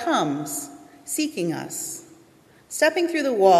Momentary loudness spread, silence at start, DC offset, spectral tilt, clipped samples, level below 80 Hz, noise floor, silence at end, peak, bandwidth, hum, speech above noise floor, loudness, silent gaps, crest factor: 14 LU; 0 s; under 0.1%; -3.5 dB/octave; under 0.1%; -72 dBFS; -54 dBFS; 0 s; -4 dBFS; 14.5 kHz; none; 32 dB; -25 LUFS; none; 18 dB